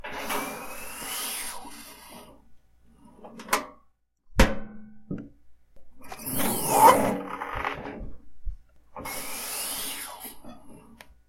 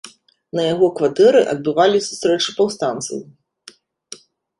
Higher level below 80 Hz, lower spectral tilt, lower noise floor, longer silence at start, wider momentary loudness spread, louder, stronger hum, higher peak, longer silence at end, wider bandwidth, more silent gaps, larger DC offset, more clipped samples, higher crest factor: first, -42 dBFS vs -62 dBFS; about the same, -3.5 dB/octave vs -4 dB/octave; first, -62 dBFS vs -47 dBFS; about the same, 0.05 s vs 0.05 s; about the same, 22 LU vs 23 LU; second, -27 LUFS vs -17 LUFS; neither; about the same, -2 dBFS vs -2 dBFS; second, 0.15 s vs 0.45 s; first, 16.5 kHz vs 11.5 kHz; neither; neither; neither; first, 28 dB vs 16 dB